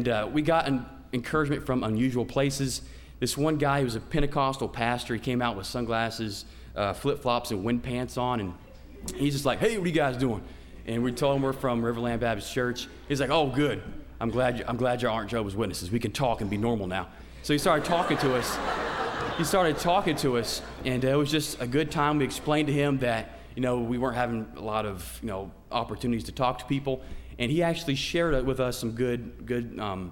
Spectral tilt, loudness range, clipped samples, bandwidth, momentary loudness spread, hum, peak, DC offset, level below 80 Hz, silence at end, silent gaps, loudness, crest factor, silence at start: -5.5 dB/octave; 4 LU; under 0.1%; 17 kHz; 9 LU; none; -10 dBFS; under 0.1%; -46 dBFS; 0 s; none; -28 LUFS; 18 dB; 0 s